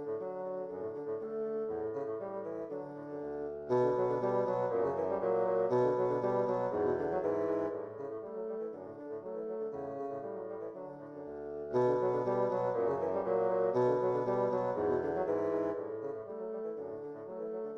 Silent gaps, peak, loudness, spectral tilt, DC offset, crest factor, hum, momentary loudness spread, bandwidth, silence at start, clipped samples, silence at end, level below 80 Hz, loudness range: none; -20 dBFS; -35 LUFS; -9 dB/octave; under 0.1%; 16 dB; none; 12 LU; 6.8 kHz; 0 s; under 0.1%; 0 s; -70 dBFS; 7 LU